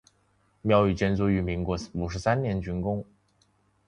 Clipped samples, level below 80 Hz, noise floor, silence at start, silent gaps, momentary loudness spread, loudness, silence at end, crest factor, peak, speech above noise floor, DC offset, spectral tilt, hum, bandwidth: under 0.1%; -44 dBFS; -67 dBFS; 0.65 s; none; 9 LU; -27 LUFS; 0.85 s; 20 dB; -8 dBFS; 41 dB; under 0.1%; -7.5 dB/octave; 50 Hz at -45 dBFS; 10.5 kHz